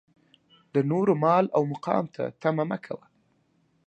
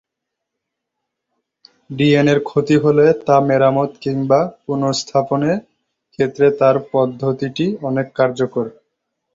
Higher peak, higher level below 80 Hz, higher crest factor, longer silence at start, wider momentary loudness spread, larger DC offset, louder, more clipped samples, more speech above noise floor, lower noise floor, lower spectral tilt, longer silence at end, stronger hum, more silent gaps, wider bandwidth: second, -8 dBFS vs -2 dBFS; second, -74 dBFS vs -56 dBFS; about the same, 20 dB vs 16 dB; second, 0.75 s vs 1.9 s; first, 12 LU vs 9 LU; neither; second, -26 LUFS vs -16 LUFS; neither; second, 43 dB vs 64 dB; second, -68 dBFS vs -80 dBFS; first, -9 dB/octave vs -6.5 dB/octave; first, 0.9 s vs 0.65 s; neither; neither; first, 8.8 kHz vs 7.8 kHz